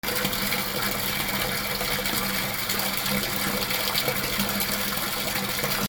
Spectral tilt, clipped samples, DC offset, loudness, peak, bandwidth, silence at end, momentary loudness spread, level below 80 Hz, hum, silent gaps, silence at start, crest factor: -2.5 dB/octave; under 0.1%; under 0.1%; -24 LUFS; -6 dBFS; over 20 kHz; 0 s; 2 LU; -46 dBFS; none; none; 0.05 s; 20 dB